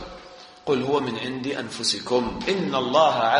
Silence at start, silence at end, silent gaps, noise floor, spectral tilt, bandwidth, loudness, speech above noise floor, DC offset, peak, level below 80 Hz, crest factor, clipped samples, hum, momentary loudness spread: 0 s; 0 s; none; -45 dBFS; -4 dB/octave; 10.5 kHz; -24 LUFS; 22 dB; under 0.1%; -4 dBFS; -52 dBFS; 20 dB; under 0.1%; none; 17 LU